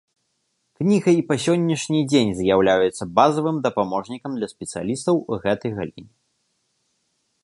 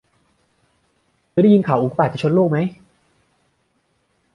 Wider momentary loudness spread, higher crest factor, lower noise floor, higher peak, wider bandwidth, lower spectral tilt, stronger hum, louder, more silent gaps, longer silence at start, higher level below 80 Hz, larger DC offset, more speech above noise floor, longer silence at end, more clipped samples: about the same, 11 LU vs 9 LU; about the same, 20 dB vs 18 dB; first, -72 dBFS vs -66 dBFS; about the same, -2 dBFS vs -2 dBFS; first, 11.5 kHz vs 6.6 kHz; second, -5.5 dB/octave vs -9 dB/octave; neither; second, -21 LUFS vs -17 LUFS; neither; second, 0.8 s vs 1.35 s; first, -54 dBFS vs -60 dBFS; neither; about the same, 51 dB vs 50 dB; second, 1.4 s vs 1.6 s; neither